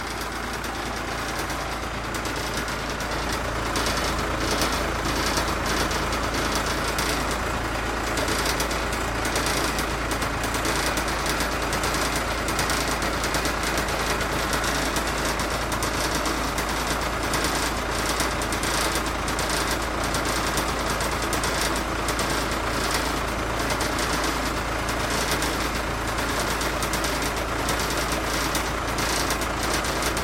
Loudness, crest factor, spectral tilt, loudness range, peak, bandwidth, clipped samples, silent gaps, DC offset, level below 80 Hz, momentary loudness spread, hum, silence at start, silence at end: -25 LUFS; 18 dB; -3 dB/octave; 1 LU; -6 dBFS; 17 kHz; under 0.1%; none; under 0.1%; -34 dBFS; 3 LU; none; 0 s; 0 s